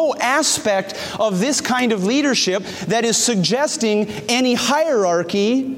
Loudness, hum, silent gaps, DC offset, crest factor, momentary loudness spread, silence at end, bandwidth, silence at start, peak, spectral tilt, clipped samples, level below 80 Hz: -18 LUFS; none; none; under 0.1%; 14 dB; 5 LU; 0 s; 16.5 kHz; 0 s; -4 dBFS; -3 dB/octave; under 0.1%; -60 dBFS